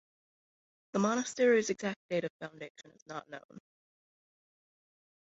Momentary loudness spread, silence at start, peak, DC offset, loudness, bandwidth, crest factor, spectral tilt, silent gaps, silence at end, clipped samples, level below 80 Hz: 21 LU; 0.95 s; -16 dBFS; under 0.1%; -32 LUFS; 8 kHz; 20 dB; -4.5 dB/octave; 1.96-2.09 s, 2.30-2.39 s, 2.70-2.75 s, 3.02-3.06 s, 3.44-3.49 s; 1.65 s; under 0.1%; -80 dBFS